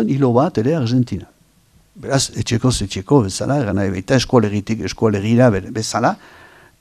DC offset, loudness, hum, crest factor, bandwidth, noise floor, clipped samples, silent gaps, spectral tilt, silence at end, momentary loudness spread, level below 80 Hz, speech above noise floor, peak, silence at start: under 0.1%; -17 LUFS; none; 18 dB; 13.5 kHz; -54 dBFS; under 0.1%; none; -5.5 dB/octave; 0.65 s; 8 LU; -42 dBFS; 37 dB; 0 dBFS; 0 s